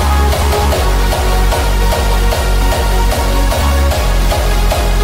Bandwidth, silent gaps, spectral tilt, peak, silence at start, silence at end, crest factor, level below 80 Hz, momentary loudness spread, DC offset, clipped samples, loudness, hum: 16.5 kHz; none; -4.5 dB/octave; -2 dBFS; 0 s; 0 s; 10 dB; -12 dBFS; 1 LU; 0.3%; under 0.1%; -14 LUFS; none